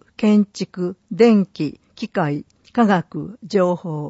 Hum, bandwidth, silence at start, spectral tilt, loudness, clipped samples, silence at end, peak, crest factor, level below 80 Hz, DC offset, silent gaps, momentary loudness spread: none; 8 kHz; 0.2 s; -7.5 dB/octave; -19 LUFS; under 0.1%; 0 s; -2 dBFS; 16 dB; -62 dBFS; under 0.1%; none; 14 LU